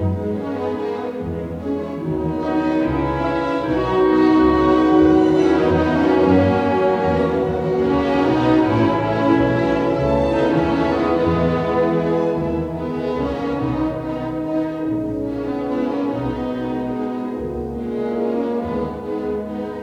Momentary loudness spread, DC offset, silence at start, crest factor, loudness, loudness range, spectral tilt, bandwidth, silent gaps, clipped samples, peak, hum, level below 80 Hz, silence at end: 10 LU; under 0.1%; 0 s; 16 dB; -19 LUFS; 8 LU; -8 dB/octave; 8 kHz; none; under 0.1%; -2 dBFS; none; -40 dBFS; 0 s